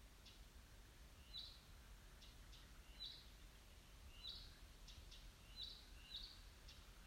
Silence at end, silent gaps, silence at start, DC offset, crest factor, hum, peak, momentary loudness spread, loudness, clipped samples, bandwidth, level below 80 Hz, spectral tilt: 0 s; none; 0 s; under 0.1%; 20 dB; none; -40 dBFS; 10 LU; -59 LUFS; under 0.1%; 16 kHz; -64 dBFS; -2.5 dB/octave